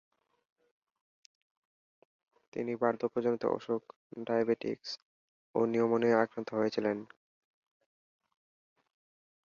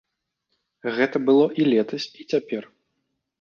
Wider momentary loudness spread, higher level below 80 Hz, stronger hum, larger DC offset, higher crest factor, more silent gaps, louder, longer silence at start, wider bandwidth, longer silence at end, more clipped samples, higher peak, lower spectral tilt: about the same, 13 LU vs 14 LU; second, -80 dBFS vs -72 dBFS; neither; neither; about the same, 22 dB vs 18 dB; first, 3.96-4.10 s, 5.02-5.54 s vs none; second, -33 LUFS vs -22 LUFS; first, 2.55 s vs 0.85 s; about the same, 7.2 kHz vs 7 kHz; first, 2.4 s vs 0.75 s; neither; second, -14 dBFS vs -6 dBFS; about the same, -6.5 dB/octave vs -6.5 dB/octave